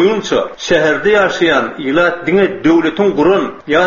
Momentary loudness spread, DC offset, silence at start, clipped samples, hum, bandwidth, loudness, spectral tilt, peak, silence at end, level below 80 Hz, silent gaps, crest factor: 4 LU; under 0.1%; 0 s; under 0.1%; none; 7.4 kHz; -13 LUFS; -3.5 dB/octave; 0 dBFS; 0 s; -44 dBFS; none; 12 dB